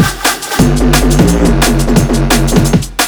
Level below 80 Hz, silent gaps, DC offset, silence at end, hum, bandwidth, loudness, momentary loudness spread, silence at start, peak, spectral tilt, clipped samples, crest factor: -16 dBFS; none; under 0.1%; 0 s; none; over 20 kHz; -10 LUFS; 3 LU; 0 s; 0 dBFS; -4.5 dB/octave; 0.7%; 10 dB